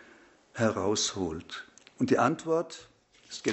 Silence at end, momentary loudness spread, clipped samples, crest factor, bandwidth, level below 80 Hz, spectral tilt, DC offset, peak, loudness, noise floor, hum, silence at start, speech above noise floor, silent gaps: 0 s; 17 LU; under 0.1%; 22 dB; 8.2 kHz; -62 dBFS; -4 dB/octave; under 0.1%; -10 dBFS; -29 LUFS; -58 dBFS; none; 0.55 s; 29 dB; none